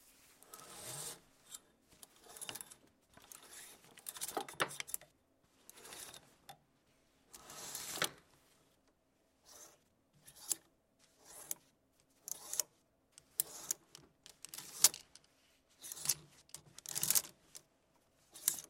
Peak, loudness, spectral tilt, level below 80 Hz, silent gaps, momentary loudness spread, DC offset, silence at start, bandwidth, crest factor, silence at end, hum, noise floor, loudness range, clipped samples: -10 dBFS; -39 LUFS; 0.5 dB/octave; -80 dBFS; none; 26 LU; under 0.1%; 0.05 s; 16.5 kHz; 36 dB; 0.05 s; none; -76 dBFS; 12 LU; under 0.1%